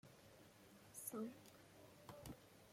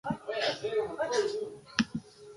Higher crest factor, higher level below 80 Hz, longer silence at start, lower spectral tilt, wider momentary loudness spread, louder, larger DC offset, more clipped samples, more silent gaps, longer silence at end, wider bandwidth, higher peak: second, 20 dB vs 26 dB; second, -78 dBFS vs -64 dBFS; about the same, 0.05 s vs 0.05 s; about the same, -4 dB/octave vs -4 dB/octave; first, 16 LU vs 5 LU; second, -57 LUFS vs -33 LUFS; neither; neither; neither; about the same, 0 s vs 0 s; first, 16.5 kHz vs 11.5 kHz; second, -36 dBFS vs -8 dBFS